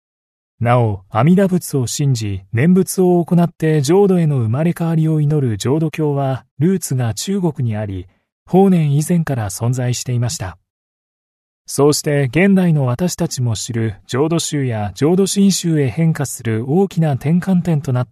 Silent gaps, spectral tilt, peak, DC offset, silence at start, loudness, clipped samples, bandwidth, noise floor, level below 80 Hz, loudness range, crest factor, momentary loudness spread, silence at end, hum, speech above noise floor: 6.51-6.57 s, 8.32-8.46 s, 10.70-11.65 s; -6 dB/octave; 0 dBFS; under 0.1%; 0.6 s; -16 LUFS; under 0.1%; 13.5 kHz; under -90 dBFS; -50 dBFS; 3 LU; 16 dB; 8 LU; 0.05 s; none; over 75 dB